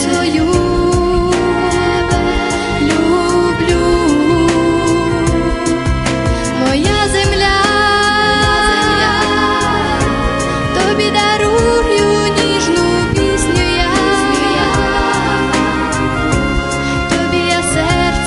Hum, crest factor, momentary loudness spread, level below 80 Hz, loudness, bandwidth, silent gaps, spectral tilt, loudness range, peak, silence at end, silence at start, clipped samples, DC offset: none; 12 dB; 4 LU; -24 dBFS; -13 LUFS; 11.5 kHz; none; -4.5 dB/octave; 2 LU; 0 dBFS; 0 s; 0 s; under 0.1%; under 0.1%